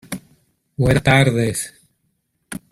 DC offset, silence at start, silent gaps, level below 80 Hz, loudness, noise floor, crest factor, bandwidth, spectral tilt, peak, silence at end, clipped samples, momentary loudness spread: under 0.1%; 0.1 s; none; -40 dBFS; -17 LUFS; -69 dBFS; 20 dB; 14.5 kHz; -5.5 dB/octave; 0 dBFS; 0.15 s; under 0.1%; 21 LU